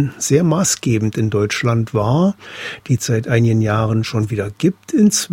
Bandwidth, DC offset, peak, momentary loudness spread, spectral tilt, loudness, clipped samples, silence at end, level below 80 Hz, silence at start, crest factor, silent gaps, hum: 16.5 kHz; under 0.1%; 0 dBFS; 6 LU; -5.5 dB/octave; -17 LUFS; under 0.1%; 0 s; -48 dBFS; 0 s; 16 dB; none; none